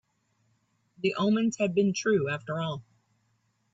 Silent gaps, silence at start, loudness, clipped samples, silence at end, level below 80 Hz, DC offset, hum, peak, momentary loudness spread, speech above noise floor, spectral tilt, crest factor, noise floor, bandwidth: none; 1.05 s; -28 LUFS; under 0.1%; 0.9 s; -70 dBFS; under 0.1%; none; -14 dBFS; 7 LU; 45 dB; -5.5 dB/octave; 16 dB; -72 dBFS; 8 kHz